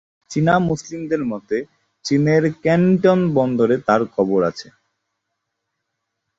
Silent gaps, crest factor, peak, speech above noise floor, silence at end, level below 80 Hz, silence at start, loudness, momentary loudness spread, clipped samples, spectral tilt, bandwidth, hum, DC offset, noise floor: none; 16 dB; -2 dBFS; 60 dB; 1.75 s; -54 dBFS; 0.3 s; -18 LUFS; 10 LU; under 0.1%; -7 dB/octave; 7.8 kHz; none; under 0.1%; -77 dBFS